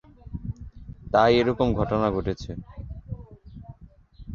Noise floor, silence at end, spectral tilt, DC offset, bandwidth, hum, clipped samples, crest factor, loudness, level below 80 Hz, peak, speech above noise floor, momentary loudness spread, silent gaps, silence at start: -49 dBFS; 0 s; -7.5 dB/octave; under 0.1%; 7.2 kHz; none; under 0.1%; 22 dB; -23 LUFS; -42 dBFS; -4 dBFS; 27 dB; 25 LU; none; 0.25 s